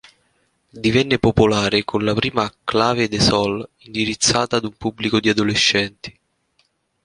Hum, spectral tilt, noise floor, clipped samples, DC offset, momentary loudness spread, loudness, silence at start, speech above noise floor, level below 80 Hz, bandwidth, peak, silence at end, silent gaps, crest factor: none; -4 dB/octave; -65 dBFS; under 0.1%; under 0.1%; 10 LU; -18 LUFS; 0.75 s; 46 dB; -42 dBFS; 11 kHz; 0 dBFS; 0.95 s; none; 20 dB